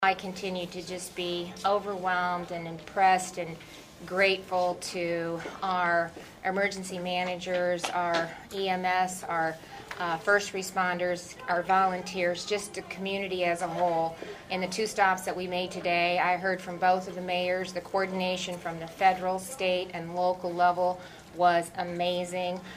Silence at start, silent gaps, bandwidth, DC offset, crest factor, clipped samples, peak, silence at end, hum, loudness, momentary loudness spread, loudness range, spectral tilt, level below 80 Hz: 0 s; none; 15.5 kHz; under 0.1%; 20 dB; under 0.1%; -10 dBFS; 0 s; none; -29 LUFS; 10 LU; 2 LU; -4 dB/octave; -64 dBFS